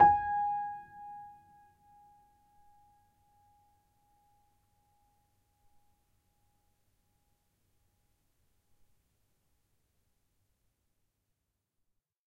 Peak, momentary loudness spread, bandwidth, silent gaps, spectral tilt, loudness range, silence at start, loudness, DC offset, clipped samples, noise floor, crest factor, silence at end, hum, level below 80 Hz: -12 dBFS; 22 LU; 3.5 kHz; none; -7 dB/octave; 24 LU; 0 s; -31 LUFS; under 0.1%; under 0.1%; -84 dBFS; 28 dB; 11.05 s; none; -68 dBFS